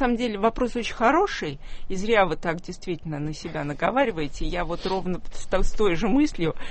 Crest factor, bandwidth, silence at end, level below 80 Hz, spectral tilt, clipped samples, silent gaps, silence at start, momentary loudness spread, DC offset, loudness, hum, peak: 18 dB; 8.6 kHz; 0 s; -32 dBFS; -5.5 dB/octave; under 0.1%; none; 0 s; 11 LU; under 0.1%; -25 LUFS; none; -6 dBFS